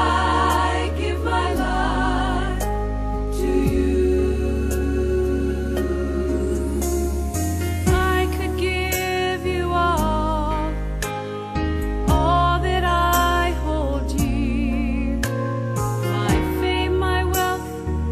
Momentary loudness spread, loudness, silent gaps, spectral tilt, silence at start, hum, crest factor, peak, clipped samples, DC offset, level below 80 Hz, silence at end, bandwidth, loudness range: 6 LU; -22 LUFS; none; -5.5 dB/octave; 0 s; none; 14 dB; -6 dBFS; under 0.1%; under 0.1%; -26 dBFS; 0 s; 14 kHz; 2 LU